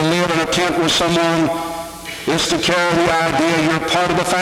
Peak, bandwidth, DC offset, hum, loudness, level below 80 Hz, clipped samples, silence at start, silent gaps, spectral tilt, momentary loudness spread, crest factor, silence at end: -4 dBFS; 17 kHz; under 0.1%; none; -16 LUFS; -44 dBFS; under 0.1%; 0 s; none; -4 dB/octave; 9 LU; 14 dB; 0 s